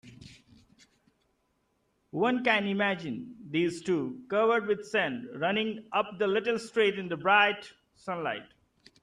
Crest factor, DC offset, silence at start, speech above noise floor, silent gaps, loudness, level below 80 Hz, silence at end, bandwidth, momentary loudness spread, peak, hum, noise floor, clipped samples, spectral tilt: 20 dB; under 0.1%; 0.05 s; 46 dB; none; -29 LUFS; -72 dBFS; 0.6 s; 11 kHz; 12 LU; -10 dBFS; none; -74 dBFS; under 0.1%; -5 dB/octave